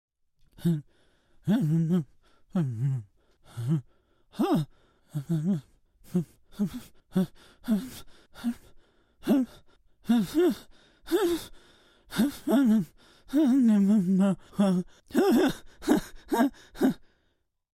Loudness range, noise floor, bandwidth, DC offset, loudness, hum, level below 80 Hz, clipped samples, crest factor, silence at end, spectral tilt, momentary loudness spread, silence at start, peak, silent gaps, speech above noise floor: 7 LU; -74 dBFS; 16 kHz; under 0.1%; -28 LUFS; none; -58 dBFS; under 0.1%; 20 dB; 0.8 s; -7 dB/octave; 16 LU; 0.6 s; -8 dBFS; none; 48 dB